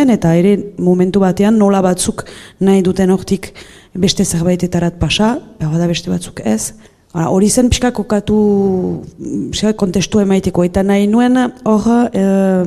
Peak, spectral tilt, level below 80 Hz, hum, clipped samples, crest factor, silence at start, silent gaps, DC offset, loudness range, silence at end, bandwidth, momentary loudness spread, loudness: 0 dBFS; -5.5 dB/octave; -34 dBFS; none; under 0.1%; 12 dB; 0 s; none; under 0.1%; 3 LU; 0 s; 13.5 kHz; 9 LU; -13 LUFS